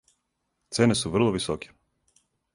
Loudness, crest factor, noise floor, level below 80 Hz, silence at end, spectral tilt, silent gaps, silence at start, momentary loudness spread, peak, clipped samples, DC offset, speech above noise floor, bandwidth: -25 LUFS; 22 dB; -78 dBFS; -54 dBFS; 0.9 s; -5 dB/octave; none; 0.7 s; 12 LU; -6 dBFS; under 0.1%; under 0.1%; 53 dB; 11.5 kHz